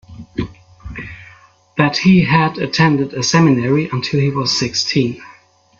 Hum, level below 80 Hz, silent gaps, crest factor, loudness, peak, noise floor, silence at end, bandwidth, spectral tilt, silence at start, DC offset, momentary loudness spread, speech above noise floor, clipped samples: none; -44 dBFS; none; 16 dB; -15 LUFS; 0 dBFS; -46 dBFS; 0.5 s; 7.6 kHz; -5 dB/octave; 0.1 s; under 0.1%; 18 LU; 32 dB; under 0.1%